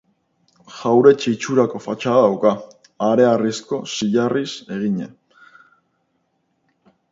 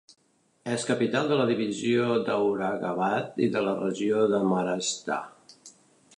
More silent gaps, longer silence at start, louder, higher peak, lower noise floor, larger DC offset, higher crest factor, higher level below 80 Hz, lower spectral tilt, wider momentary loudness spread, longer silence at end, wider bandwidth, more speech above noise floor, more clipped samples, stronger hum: neither; about the same, 0.7 s vs 0.65 s; first, -18 LUFS vs -27 LUFS; first, 0 dBFS vs -12 dBFS; about the same, -68 dBFS vs -68 dBFS; neither; about the same, 20 dB vs 16 dB; first, -66 dBFS vs -72 dBFS; about the same, -5.5 dB/octave vs -5 dB/octave; first, 13 LU vs 7 LU; first, 2.05 s vs 0.5 s; second, 8 kHz vs 11 kHz; first, 51 dB vs 42 dB; neither; neither